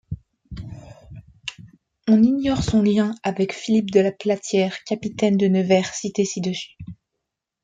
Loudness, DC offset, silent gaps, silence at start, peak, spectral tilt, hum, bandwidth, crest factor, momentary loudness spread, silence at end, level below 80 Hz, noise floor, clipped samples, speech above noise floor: -21 LUFS; under 0.1%; none; 0.1 s; -4 dBFS; -6 dB/octave; none; 9.2 kHz; 18 dB; 19 LU; 0.7 s; -48 dBFS; -81 dBFS; under 0.1%; 61 dB